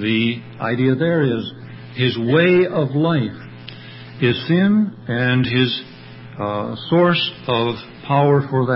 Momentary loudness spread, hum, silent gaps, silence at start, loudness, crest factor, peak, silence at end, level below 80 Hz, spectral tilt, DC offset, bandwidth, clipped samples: 20 LU; none; none; 0 s; -18 LUFS; 16 dB; -4 dBFS; 0 s; -54 dBFS; -11.5 dB/octave; under 0.1%; 5.8 kHz; under 0.1%